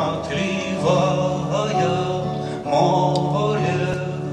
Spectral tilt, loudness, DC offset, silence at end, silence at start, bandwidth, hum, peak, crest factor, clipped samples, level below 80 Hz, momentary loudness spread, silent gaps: -6 dB/octave; -21 LUFS; under 0.1%; 0 s; 0 s; 9.8 kHz; none; -6 dBFS; 14 dB; under 0.1%; -48 dBFS; 6 LU; none